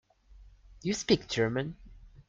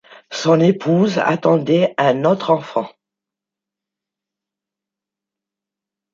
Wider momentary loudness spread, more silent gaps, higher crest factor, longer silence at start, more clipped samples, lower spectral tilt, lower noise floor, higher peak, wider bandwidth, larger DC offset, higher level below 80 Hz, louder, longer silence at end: first, 13 LU vs 10 LU; neither; first, 24 dB vs 18 dB; about the same, 0.35 s vs 0.3 s; neither; second, -4.5 dB/octave vs -6.5 dB/octave; second, -56 dBFS vs -86 dBFS; second, -8 dBFS vs -2 dBFS; first, 9.4 kHz vs 7.6 kHz; neither; first, -54 dBFS vs -66 dBFS; second, -31 LUFS vs -16 LUFS; second, 0.1 s vs 3.25 s